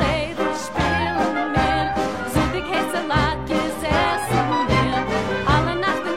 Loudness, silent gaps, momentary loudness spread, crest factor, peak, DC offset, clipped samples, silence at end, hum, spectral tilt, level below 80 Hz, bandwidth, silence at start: -21 LUFS; none; 4 LU; 16 dB; -4 dBFS; 0.7%; under 0.1%; 0 s; none; -5.5 dB/octave; -34 dBFS; 16 kHz; 0 s